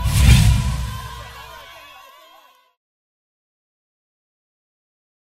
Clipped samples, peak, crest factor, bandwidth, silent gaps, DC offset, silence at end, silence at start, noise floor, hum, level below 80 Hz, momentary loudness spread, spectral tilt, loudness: under 0.1%; 0 dBFS; 22 dB; 16 kHz; none; under 0.1%; 3.75 s; 0 s; -51 dBFS; none; -24 dBFS; 26 LU; -5 dB/octave; -16 LUFS